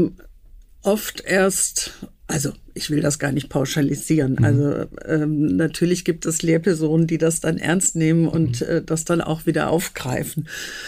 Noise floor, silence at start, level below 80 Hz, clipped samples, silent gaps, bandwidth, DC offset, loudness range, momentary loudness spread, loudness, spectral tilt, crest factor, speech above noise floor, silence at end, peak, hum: -45 dBFS; 0 s; -46 dBFS; under 0.1%; none; 15.5 kHz; under 0.1%; 2 LU; 8 LU; -21 LUFS; -5 dB/octave; 12 dB; 25 dB; 0 s; -8 dBFS; none